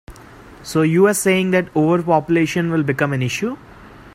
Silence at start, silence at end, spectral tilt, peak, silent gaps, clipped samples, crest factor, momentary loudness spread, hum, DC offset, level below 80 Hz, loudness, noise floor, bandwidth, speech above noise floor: 0.1 s; 0.05 s; -5.5 dB/octave; -2 dBFS; none; under 0.1%; 16 dB; 9 LU; none; under 0.1%; -50 dBFS; -17 LUFS; -41 dBFS; 16 kHz; 24 dB